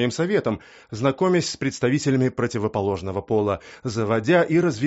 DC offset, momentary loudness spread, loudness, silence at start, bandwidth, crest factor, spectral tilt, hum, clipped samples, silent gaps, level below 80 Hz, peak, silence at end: under 0.1%; 9 LU; -23 LUFS; 0 s; 8 kHz; 14 dB; -5.5 dB/octave; none; under 0.1%; none; -56 dBFS; -8 dBFS; 0 s